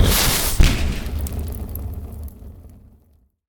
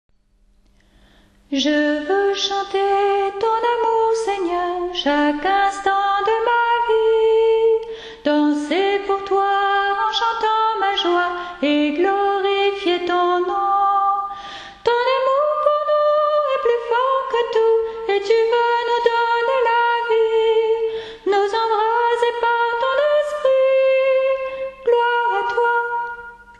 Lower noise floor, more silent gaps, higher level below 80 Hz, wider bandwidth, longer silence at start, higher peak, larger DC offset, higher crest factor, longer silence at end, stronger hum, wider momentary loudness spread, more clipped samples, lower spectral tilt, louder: about the same, -57 dBFS vs -57 dBFS; neither; first, -24 dBFS vs -54 dBFS; first, over 20 kHz vs 10 kHz; second, 0 s vs 1.5 s; about the same, -2 dBFS vs -4 dBFS; neither; about the same, 20 dB vs 16 dB; first, 0.8 s vs 0.25 s; neither; first, 20 LU vs 5 LU; neither; about the same, -3.5 dB/octave vs -3 dB/octave; second, -21 LUFS vs -18 LUFS